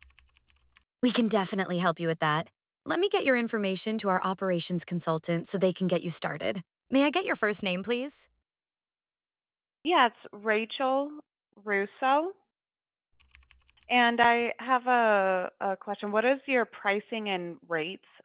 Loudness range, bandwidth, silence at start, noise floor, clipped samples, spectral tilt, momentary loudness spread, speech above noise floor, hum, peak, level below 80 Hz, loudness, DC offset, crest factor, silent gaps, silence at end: 5 LU; 4 kHz; 1.05 s; under -90 dBFS; under 0.1%; -3 dB/octave; 10 LU; over 62 dB; none; -8 dBFS; -72 dBFS; -28 LUFS; under 0.1%; 22 dB; none; 0.25 s